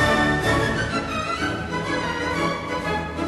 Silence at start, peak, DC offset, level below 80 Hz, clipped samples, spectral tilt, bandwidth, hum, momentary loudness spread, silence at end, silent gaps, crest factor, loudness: 0 s; -8 dBFS; under 0.1%; -38 dBFS; under 0.1%; -5 dB/octave; 12.5 kHz; none; 6 LU; 0 s; none; 14 dB; -23 LUFS